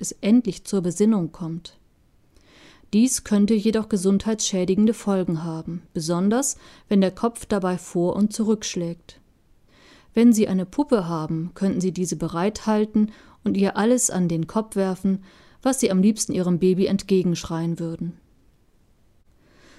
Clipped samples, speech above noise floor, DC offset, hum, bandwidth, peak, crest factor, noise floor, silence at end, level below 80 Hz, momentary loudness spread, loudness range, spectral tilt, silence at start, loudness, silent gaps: under 0.1%; 37 dB; under 0.1%; none; 13.5 kHz; -4 dBFS; 18 dB; -58 dBFS; 1.65 s; -52 dBFS; 10 LU; 3 LU; -5.5 dB/octave; 0 s; -22 LUFS; none